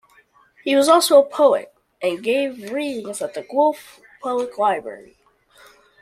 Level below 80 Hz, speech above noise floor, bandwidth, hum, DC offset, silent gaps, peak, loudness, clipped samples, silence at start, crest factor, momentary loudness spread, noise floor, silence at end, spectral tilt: -70 dBFS; 36 dB; 15 kHz; none; under 0.1%; none; -2 dBFS; -19 LUFS; under 0.1%; 0.65 s; 18 dB; 14 LU; -55 dBFS; 1 s; -2.5 dB/octave